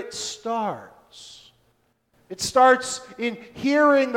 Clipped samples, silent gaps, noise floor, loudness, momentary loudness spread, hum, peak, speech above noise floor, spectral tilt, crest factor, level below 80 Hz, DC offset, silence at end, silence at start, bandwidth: under 0.1%; none; -66 dBFS; -22 LUFS; 25 LU; none; -4 dBFS; 45 dB; -3 dB/octave; 20 dB; -62 dBFS; under 0.1%; 0 s; 0 s; 16.5 kHz